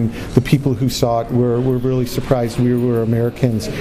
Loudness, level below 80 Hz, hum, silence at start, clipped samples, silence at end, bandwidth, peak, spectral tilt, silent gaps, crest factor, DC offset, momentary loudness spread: -17 LUFS; -36 dBFS; none; 0 s; under 0.1%; 0 s; 16 kHz; 0 dBFS; -7 dB/octave; none; 16 dB; under 0.1%; 3 LU